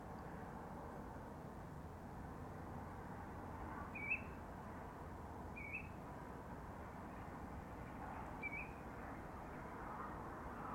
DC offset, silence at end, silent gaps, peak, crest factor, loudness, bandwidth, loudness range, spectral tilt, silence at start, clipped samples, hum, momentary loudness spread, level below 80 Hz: under 0.1%; 0 s; none; -32 dBFS; 20 dB; -50 LUFS; 18 kHz; 4 LU; -7 dB/octave; 0 s; under 0.1%; none; 6 LU; -60 dBFS